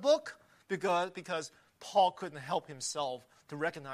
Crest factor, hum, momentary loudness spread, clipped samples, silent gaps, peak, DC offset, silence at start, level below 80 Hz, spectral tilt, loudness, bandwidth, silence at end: 20 dB; none; 18 LU; under 0.1%; none; -14 dBFS; under 0.1%; 0 s; -80 dBFS; -3.5 dB/octave; -34 LUFS; 14.5 kHz; 0 s